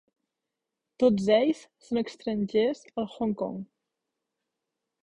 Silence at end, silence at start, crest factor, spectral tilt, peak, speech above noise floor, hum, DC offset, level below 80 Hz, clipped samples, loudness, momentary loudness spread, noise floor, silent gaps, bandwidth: 1.4 s; 1 s; 20 dB; -6.5 dB/octave; -10 dBFS; 59 dB; none; under 0.1%; -64 dBFS; under 0.1%; -28 LUFS; 12 LU; -86 dBFS; none; 10.5 kHz